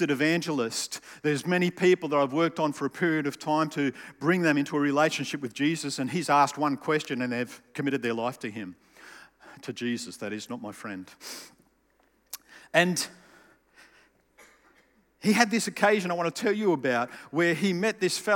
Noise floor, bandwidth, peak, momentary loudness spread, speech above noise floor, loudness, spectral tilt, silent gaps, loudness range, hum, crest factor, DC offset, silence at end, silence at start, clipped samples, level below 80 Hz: -67 dBFS; 17.5 kHz; -4 dBFS; 15 LU; 40 dB; -27 LUFS; -4.5 dB/octave; none; 10 LU; none; 24 dB; under 0.1%; 0 s; 0 s; under 0.1%; -76 dBFS